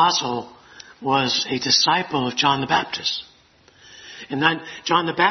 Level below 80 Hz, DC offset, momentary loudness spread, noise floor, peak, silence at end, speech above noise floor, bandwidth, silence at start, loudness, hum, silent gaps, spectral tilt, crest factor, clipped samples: -62 dBFS; under 0.1%; 14 LU; -54 dBFS; 0 dBFS; 0 s; 33 dB; 6.4 kHz; 0 s; -20 LUFS; none; none; -3 dB/octave; 22 dB; under 0.1%